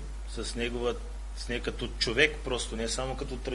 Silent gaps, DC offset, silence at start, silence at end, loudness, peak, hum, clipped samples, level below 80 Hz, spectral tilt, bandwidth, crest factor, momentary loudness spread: none; under 0.1%; 0 s; 0 s; -31 LUFS; -8 dBFS; none; under 0.1%; -38 dBFS; -3.5 dB/octave; 11.5 kHz; 24 dB; 14 LU